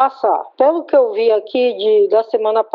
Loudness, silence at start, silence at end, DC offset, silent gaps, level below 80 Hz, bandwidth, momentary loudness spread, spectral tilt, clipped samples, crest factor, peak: -15 LUFS; 0 s; 0.1 s; under 0.1%; none; -76 dBFS; 5.2 kHz; 4 LU; -1.5 dB/octave; under 0.1%; 12 dB; -2 dBFS